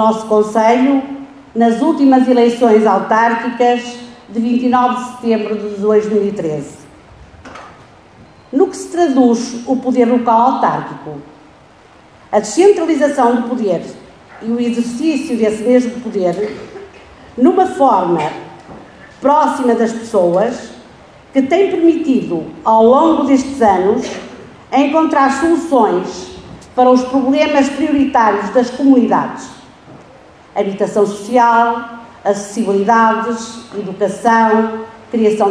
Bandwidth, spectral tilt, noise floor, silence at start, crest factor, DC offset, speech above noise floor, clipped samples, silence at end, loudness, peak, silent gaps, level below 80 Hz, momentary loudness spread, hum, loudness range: 11 kHz; -5.5 dB/octave; -43 dBFS; 0 s; 14 dB; under 0.1%; 31 dB; under 0.1%; 0 s; -13 LUFS; 0 dBFS; none; -52 dBFS; 15 LU; none; 4 LU